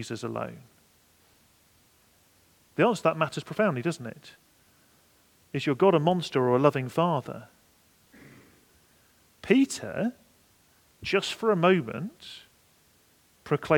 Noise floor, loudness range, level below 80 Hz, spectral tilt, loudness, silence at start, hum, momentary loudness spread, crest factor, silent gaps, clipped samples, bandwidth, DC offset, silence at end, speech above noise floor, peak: -63 dBFS; 5 LU; -68 dBFS; -6 dB/octave; -27 LUFS; 0 s; none; 19 LU; 24 dB; none; under 0.1%; 18.5 kHz; under 0.1%; 0 s; 37 dB; -6 dBFS